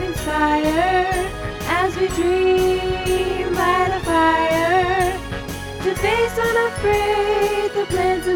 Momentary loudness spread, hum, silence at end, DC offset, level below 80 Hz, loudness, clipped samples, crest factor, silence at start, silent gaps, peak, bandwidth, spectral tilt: 7 LU; none; 0 s; under 0.1%; -34 dBFS; -19 LUFS; under 0.1%; 14 dB; 0 s; none; -6 dBFS; 19.5 kHz; -5 dB/octave